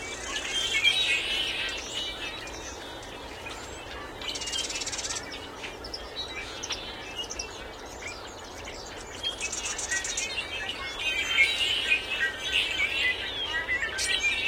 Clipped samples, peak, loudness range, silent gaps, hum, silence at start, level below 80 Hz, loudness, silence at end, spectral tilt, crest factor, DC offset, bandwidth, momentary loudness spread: under 0.1%; -10 dBFS; 10 LU; none; none; 0 s; -50 dBFS; -28 LUFS; 0 s; -0.5 dB/octave; 22 dB; under 0.1%; 16.5 kHz; 16 LU